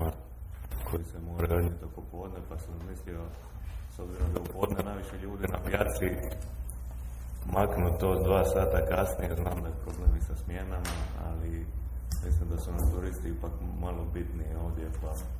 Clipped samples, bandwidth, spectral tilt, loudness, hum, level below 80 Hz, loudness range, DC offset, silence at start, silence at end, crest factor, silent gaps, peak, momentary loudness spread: under 0.1%; 16 kHz; -7 dB/octave; -33 LUFS; none; -34 dBFS; 7 LU; under 0.1%; 0 s; 0 s; 20 dB; none; -10 dBFS; 14 LU